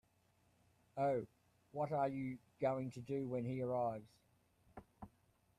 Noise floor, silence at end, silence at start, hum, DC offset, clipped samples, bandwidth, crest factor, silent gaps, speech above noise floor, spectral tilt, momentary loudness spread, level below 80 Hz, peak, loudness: -76 dBFS; 0.5 s; 0.95 s; none; under 0.1%; under 0.1%; 14 kHz; 18 dB; none; 35 dB; -8.5 dB/octave; 21 LU; -76 dBFS; -26 dBFS; -42 LUFS